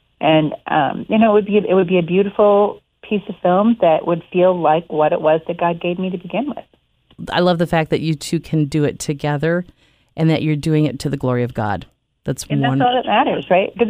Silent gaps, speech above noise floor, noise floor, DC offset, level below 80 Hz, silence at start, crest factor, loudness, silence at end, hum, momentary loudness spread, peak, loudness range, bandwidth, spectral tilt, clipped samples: none; 38 dB; -55 dBFS; under 0.1%; -50 dBFS; 0.2 s; 14 dB; -17 LUFS; 0 s; none; 9 LU; -2 dBFS; 4 LU; 15.5 kHz; -6.5 dB/octave; under 0.1%